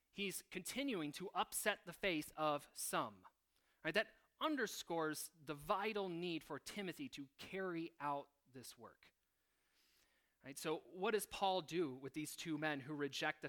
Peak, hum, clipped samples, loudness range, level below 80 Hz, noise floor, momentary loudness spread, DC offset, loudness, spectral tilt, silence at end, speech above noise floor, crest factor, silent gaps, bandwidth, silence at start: -22 dBFS; none; under 0.1%; 8 LU; -76 dBFS; -85 dBFS; 11 LU; under 0.1%; -44 LUFS; -3.5 dB/octave; 0 s; 41 dB; 24 dB; none; 19 kHz; 0.15 s